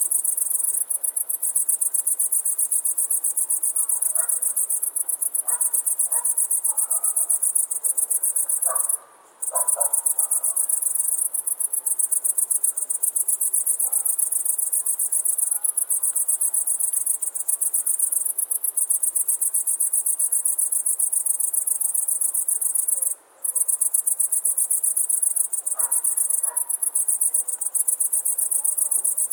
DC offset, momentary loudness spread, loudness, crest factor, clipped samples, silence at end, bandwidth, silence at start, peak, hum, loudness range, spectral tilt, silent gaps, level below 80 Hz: under 0.1%; 3 LU; -20 LUFS; 20 dB; under 0.1%; 0 s; 19.5 kHz; 0 s; -2 dBFS; none; 1 LU; 3 dB/octave; none; under -90 dBFS